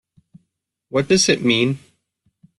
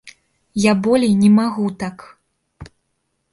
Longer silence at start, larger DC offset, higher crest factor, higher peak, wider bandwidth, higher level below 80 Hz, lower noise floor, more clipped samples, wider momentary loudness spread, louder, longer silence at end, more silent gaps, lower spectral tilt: first, 0.95 s vs 0.05 s; neither; about the same, 18 dB vs 16 dB; about the same, -4 dBFS vs -2 dBFS; about the same, 12 kHz vs 11.5 kHz; about the same, -56 dBFS vs -52 dBFS; about the same, -74 dBFS vs -71 dBFS; neither; second, 9 LU vs 15 LU; about the same, -17 LUFS vs -16 LUFS; about the same, 0.8 s vs 0.7 s; neither; second, -3.5 dB/octave vs -6.5 dB/octave